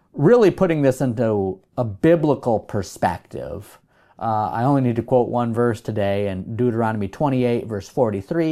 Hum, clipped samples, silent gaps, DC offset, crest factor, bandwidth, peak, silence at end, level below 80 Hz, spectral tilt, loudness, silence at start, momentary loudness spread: none; under 0.1%; none; under 0.1%; 16 dB; 14.5 kHz; -4 dBFS; 0 s; -52 dBFS; -8 dB/octave; -20 LUFS; 0.15 s; 10 LU